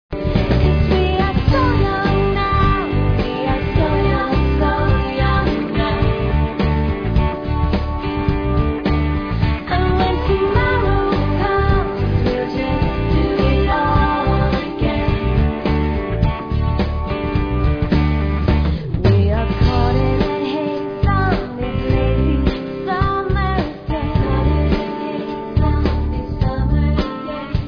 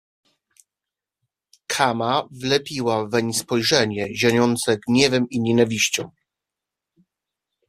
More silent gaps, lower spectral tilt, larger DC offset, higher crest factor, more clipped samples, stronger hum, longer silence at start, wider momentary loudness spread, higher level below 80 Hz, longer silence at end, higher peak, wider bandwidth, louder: neither; first, -9 dB/octave vs -4 dB/octave; neither; second, 16 dB vs 22 dB; neither; neither; second, 0.1 s vs 1.7 s; about the same, 5 LU vs 6 LU; first, -22 dBFS vs -58 dBFS; second, 0 s vs 1.6 s; about the same, -2 dBFS vs -2 dBFS; second, 5.4 kHz vs 15 kHz; about the same, -18 LUFS vs -20 LUFS